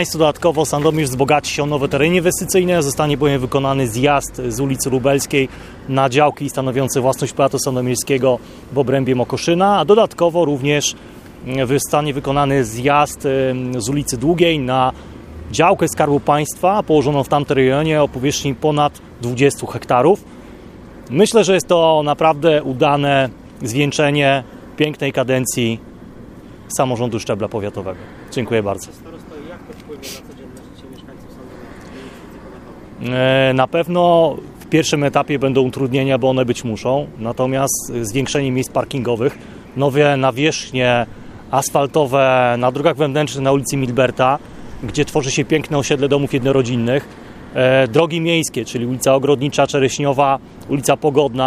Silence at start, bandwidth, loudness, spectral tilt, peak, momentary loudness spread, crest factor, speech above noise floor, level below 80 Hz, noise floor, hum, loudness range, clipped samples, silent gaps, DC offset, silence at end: 0 s; 15.5 kHz; -16 LUFS; -5 dB/octave; 0 dBFS; 14 LU; 16 dB; 21 dB; -44 dBFS; -37 dBFS; none; 7 LU; under 0.1%; none; under 0.1%; 0 s